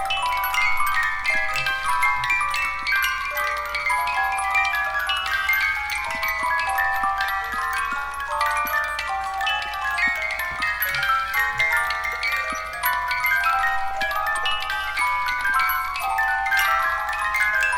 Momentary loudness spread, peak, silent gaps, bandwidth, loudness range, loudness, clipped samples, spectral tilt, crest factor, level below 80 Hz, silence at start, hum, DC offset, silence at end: 5 LU; -8 dBFS; none; 17 kHz; 2 LU; -22 LUFS; under 0.1%; -0.5 dB/octave; 16 dB; -44 dBFS; 0 s; none; under 0.1%; 0 s